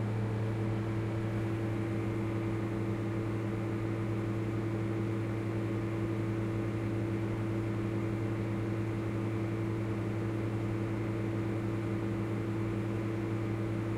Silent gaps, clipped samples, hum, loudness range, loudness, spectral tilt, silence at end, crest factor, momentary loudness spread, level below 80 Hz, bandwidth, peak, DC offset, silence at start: none; under 0.1%; 50 Hz at -45 dBFS; 0 LU; -34 LUFS; -8.5 dB/octave; 0 s; 10 dB; 1 LU; -52 dBFS; 10.5 kHz; -22 dBFS; under 0.1%; 0 s